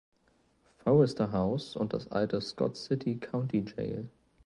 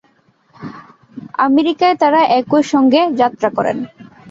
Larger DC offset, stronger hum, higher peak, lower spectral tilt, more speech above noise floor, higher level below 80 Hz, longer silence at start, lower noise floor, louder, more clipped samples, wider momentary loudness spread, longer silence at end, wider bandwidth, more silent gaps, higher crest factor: neither; neither; second, -12 dBFS vs -2 dBFS; first, -7.5 dB/octave vs -5.5 dB/octave; about the same, 39 dB vs 42 dB; about the same, -60 dBFS vs -60 dBFS; first, 0.85 s vs 0.6 s; first, -69 dBFS vs -55 dBFS; second, -31 LUFS vs -14 LUFS; neither; second, 11 LU vs 21 LU; first, 0.4 s vs 0 s; first, 11 kHz vs 7.8 kHz; neither; first, 20 dB vs 14 dB